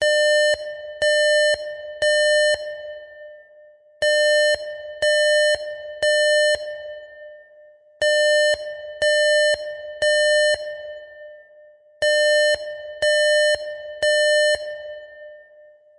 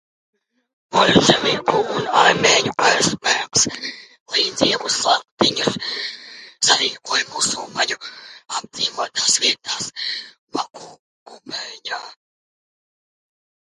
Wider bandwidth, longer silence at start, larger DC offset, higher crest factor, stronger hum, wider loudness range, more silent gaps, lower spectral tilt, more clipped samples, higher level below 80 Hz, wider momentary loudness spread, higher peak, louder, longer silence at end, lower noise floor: about the same, 11 kHz vs 11.5 kHz; second, 0 s vs 0.9 s; neither; second, 12 dB vs 22 dB; neither; second, 2 LU vs 12 LU; second, none vs 4.20-4.26 s, 5.31-5.37 s, 10.38-10.47 s, 10.99-11.26 s; second, 1 dB/octave vs -2 dB/octave; neither; about the same, -60 dBFS vs -58 dBFS; about the same, 16 LU vs 15 LU; second, -10 dBFS vs 0 dBFS; about the same, -19 LUFS vs -18 LUFS; second, 0.6 s vs 1.55 s; first, -50 dBFS vs -40 dBFS